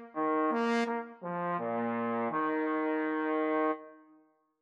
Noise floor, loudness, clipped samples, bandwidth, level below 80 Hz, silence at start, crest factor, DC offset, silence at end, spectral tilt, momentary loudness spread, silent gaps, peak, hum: -65 dBFS; -32 LUFS; under 0.1%; 8.6 kHz; under -90 dBFS; 0 s; 16 dB; under 0.1%; 0.65 s; -6.5 dB/octave; 6 LU; none; -16 dBFS; none